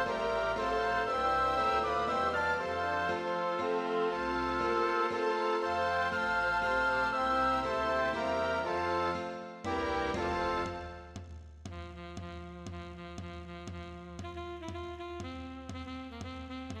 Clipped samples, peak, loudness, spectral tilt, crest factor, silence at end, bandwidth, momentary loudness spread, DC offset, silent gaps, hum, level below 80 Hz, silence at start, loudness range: under 0.1%; -18 dBFS; -32 LUFS; -5 dB/octave; 14 dB; 0 s; 13 kHz; 15 LU; under 0.1%; none; none; -52 dBFS; 0 s; 13 LU